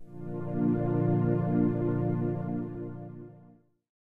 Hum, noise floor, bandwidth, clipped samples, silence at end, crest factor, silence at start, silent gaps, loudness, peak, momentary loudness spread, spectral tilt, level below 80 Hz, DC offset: none; -58 dBFS; 3.3 kHz; under 0.1%; 0.5 s; 14 dB; 0 s; none; -30 LUFS; -16 dBFS; 16 LU; -12.5 dB/octave; -52 dBFS; under 0.1%